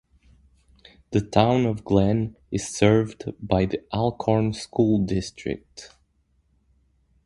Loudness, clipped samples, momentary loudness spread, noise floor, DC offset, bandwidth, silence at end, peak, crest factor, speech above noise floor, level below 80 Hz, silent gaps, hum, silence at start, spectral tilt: -23 LUFS; under 0.1%; 13 LU; -66 dBFS; under 0.1%; 11.5 kHz; 1.4 s; -2 dBFS; 24 dB; 44 dB; -46 dBFS; none; none; 1.1 s; -6.5 dB/octave